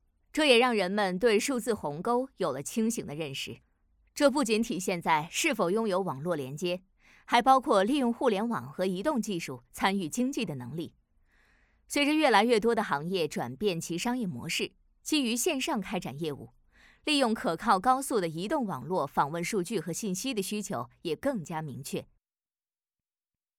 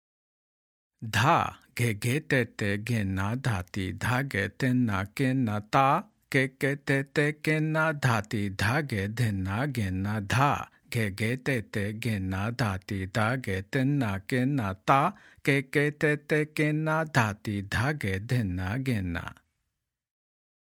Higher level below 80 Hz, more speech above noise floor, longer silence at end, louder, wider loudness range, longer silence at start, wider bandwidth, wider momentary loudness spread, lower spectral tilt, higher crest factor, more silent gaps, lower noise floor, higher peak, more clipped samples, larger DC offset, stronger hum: second, -64 dBFS vs -58 dBFS; first, over 61 dB vs 56 dB; first, 1.55 s vs 1.3 s; about the same, -29 LUFS vs -28 LUFS; about the same, 5 LU vs 3 LU; second, 0.35 s vs 1 s; about the same, 18.5 kHz vs 17 kHz; first, 13 LU vs 6 LU; second, -4 dB/octave vs -6 dB/octave; about the same, 22 dB vs 22 dB; neither; first, under -90 dBFS vs -84 dBFS; about the same, -8 dBFS vs -6 dBFS; neither; neither; neither